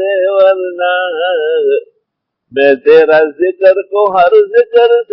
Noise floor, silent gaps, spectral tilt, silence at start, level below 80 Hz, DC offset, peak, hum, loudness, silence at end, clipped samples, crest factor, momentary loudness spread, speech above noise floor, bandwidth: -72 dBFS; none; -6.5 dB/octave; 0 s; -60 dBFS; under 0.1%; 0 dBFS; none; -10 LUFS; 0.1 s; 0.2%; 10 dB; 7 LU; 62 dB; 5.6 kHz